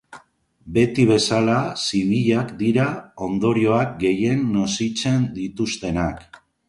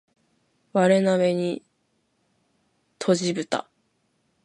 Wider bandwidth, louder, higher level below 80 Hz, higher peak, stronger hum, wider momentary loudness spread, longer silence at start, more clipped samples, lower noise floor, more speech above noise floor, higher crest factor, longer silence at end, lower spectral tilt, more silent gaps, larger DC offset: about the same, 11.5 kHz vs 11 kHz; about the same, -21 LUFS vs -23 LUFS; first, -46 dBFS vs -74 dBFS; about the same, -4 dBFS vs -6 dBFS; neither; second, 8 LU vs 11 LU; second, 0.1 s vs 0.75 s; neither; second, -55 dBFS vs -71 dBFS; second, 35 dB vs 49 dB; about the same, 16 dB vs 20 dB; second, 0.45 s vs 0.85 s; about the same, -5.5 dB/octave vs -5.5 dB/octave; neither; neither